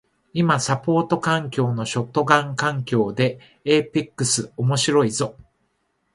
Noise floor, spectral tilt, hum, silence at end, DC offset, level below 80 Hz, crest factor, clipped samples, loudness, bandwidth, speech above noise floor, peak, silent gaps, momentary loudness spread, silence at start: -70 dBFS; -4.5 dB/octave; none; 0.7 s; under 0.1%; -58 dBFS; 20 dB; under 0.1%; -21 LUFS; 11.5 kHz; 49 dB; 0 dBFS; none; 7 LU; 0.35 s